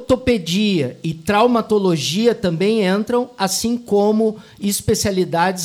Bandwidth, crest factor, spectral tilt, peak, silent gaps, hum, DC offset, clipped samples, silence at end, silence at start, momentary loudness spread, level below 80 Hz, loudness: 16.5 kHz; 14 dB; -4.5 dB/octave; -4 dBFS; none; none; under 0.1%; under 0.1%; 0 s; 0 s; 6 LU; -44 dBFS; -18 LUFS